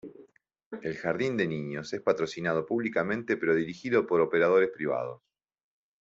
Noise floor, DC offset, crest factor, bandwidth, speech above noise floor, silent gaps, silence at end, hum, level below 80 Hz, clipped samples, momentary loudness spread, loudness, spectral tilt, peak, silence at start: -58 dBFS; under 0.1%; 18 dB; 7.8 kHz; 30 dB; 0.66-0.71 s; 0.85 s; none; -70 dBFS; under 0.1%; 11 LU; -28 LUFS; -6.5 dB/octave; -10 dBFS; 0.05 s